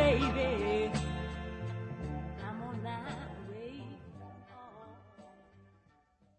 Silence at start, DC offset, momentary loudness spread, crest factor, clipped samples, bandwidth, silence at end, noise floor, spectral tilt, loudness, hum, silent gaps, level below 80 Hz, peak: 0 s; under 0.1%; 22 LU; 22 dB; under 0.1%; 9.6 kHz; 0.75 s; -68 dBFS; -6.5 dB/octave; -36 LUFS; none; none; -48 dBFS; -14 dBFS